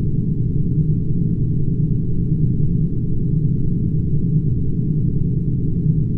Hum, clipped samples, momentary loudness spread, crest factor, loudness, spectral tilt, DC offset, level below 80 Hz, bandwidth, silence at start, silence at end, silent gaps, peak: none; under 0.1%; 2 LU; 12 dB; -20 LUFS; -14.5 dB/octave; under 0.1%; -26 dBFS; 0.8 kHz; 0 s; 0 s; none; -6 dBFS